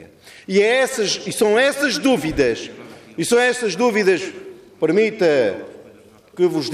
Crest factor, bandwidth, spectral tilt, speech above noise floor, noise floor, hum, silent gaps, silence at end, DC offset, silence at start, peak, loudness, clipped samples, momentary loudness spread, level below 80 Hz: 14 dB; 15.5 kHz; -4 dB/octave; 29 dB; -46 dBFS; none; none; 0 s; under 0.1%; 0 s; -4 dBFS; -18 LUFS; under 0.1%; 17 LU; -50 dBFS